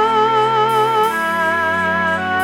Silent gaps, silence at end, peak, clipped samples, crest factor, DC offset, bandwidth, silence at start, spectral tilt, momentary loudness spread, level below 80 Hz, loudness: none; 0 s; -4 dBFS; under 0.1%; 10 dB; under 0.1%; 18 kHz; 0 s; -4.5 dB/octave; 3 LU; -56 dBFS; -15 LUFS